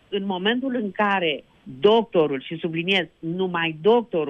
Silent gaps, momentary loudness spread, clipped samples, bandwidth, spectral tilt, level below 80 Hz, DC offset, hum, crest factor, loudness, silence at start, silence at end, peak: none; 9 LU; under 0.1%; 7 kHz; -7 dB/octave; -64 dBFS; under 0.1%; none; 18 dB; -22 LUFS; 0.1 s; 0 s; -4 dBFS